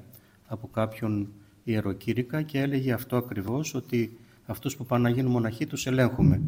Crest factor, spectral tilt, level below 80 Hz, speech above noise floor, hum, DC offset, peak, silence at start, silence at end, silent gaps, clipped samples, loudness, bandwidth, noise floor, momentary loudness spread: 18 dB; -6.5 dB/octave; -52 dBFS; 26 dB; none; under 0.1%; -10 dBFS; 0 s; 0 s; none; under 0.1%; -28 LUFS; 16.5 kHz; -53 dBFS; 11 LU